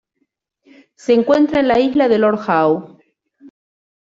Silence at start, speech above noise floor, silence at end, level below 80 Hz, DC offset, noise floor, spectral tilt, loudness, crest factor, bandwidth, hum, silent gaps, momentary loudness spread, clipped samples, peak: 1.1 s; 56 dB; 0.7 s; -54 dBFS; under 0.1%; -69 dBFS; -6.5 dB/octave; -15 LUFS; 14 dB; 8 kHz; none; none; 4 LU; under 0.1%; -2 dBFS